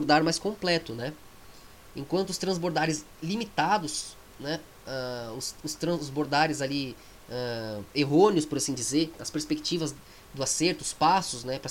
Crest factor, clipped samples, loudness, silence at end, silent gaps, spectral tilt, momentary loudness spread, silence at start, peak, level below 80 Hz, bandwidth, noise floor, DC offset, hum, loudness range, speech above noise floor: 20 dB; under 0.1%; -28 LUFS; 0 s; none; -4 dB/octave; 13 LU; 0 s; -8 dBFS; -58 dBFS; 17 kHz; -49 dBFS; under 0.1%; none; 4 LU; 21 dB